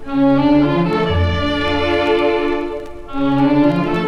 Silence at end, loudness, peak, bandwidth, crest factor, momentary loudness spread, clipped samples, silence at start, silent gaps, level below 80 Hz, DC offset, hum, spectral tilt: 0 s; -16 LUFS; -4 dBFS; 7 kHz; 12 dB; 8 LU; under 0.1%; 0 s; none; -34 dBFS; under 0.1%; none; -7.5 dB/octave